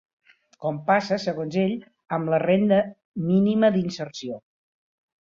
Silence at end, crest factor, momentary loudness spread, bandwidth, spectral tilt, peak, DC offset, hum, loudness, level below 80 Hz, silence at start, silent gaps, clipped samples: 0.85 s; 18 dB; 13 LU; 7.4 kHz; -7 dB/octave; -8 dBFS; under 0.1%; none; -23 LUFS; -66 dBFS; 0.6 s; 3.05-3.14 s; under 0.1%